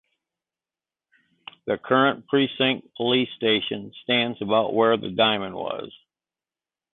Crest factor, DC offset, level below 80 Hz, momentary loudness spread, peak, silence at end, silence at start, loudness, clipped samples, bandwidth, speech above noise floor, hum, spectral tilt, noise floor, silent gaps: 18 dB; under 0.1%; -64 dBFS; 11 LU; -6 dBFS; 1.05 s; 1.65 s; -23 LUFS; under 0.1%; 4.2 kHz; over 67 dB; none; -9 dB/octave; under -90 dBFS; none